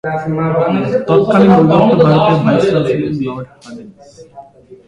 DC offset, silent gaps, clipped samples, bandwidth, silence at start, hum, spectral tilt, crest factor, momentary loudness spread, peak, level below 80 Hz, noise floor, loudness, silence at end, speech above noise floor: under 0.1%; none; under 0.1%; 10 kHz; 0.05 s; none; -8.5 dB/octave; 12 dB; 16 LU; 0 dBFS; -46 dBFS; -37 dBFS; -12 LUFS; 0.15 s; 25 dB